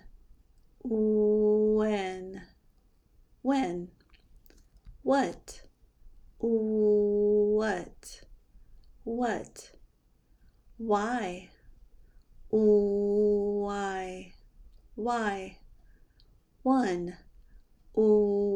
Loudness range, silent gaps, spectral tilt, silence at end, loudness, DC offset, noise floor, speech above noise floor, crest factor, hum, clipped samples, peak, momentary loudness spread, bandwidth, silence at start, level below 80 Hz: 7 LU; none; -6.5 dB/octave; 0 s; -28 LUFS; under 0.1%; -65 dBFS; 38 dB; 16 dB; none; under 0.1%; -14 dBFS; 20 LU; 10.5 kHz; 0.05 s; -56 dBFS